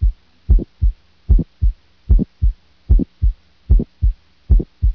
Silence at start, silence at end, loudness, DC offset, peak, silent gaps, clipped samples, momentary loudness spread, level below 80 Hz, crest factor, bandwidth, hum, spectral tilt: 0 s; 0 s; -20 LUFS; 0.2%; -2 dBFS; none; under 0.1%; 19 LU; -16 dBFS; 14 dB; 0.9 kHz; none; -12 dB/octave